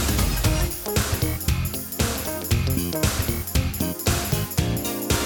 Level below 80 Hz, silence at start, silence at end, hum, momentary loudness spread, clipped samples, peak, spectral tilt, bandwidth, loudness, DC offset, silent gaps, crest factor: -30 dBFS; 0 s; 0 s; none; 3 LU; under 0.1%; -8 dBFS; -4 dB/octave; over 20 kHz; -24 LUFS; under 0.1%; none; 16 dB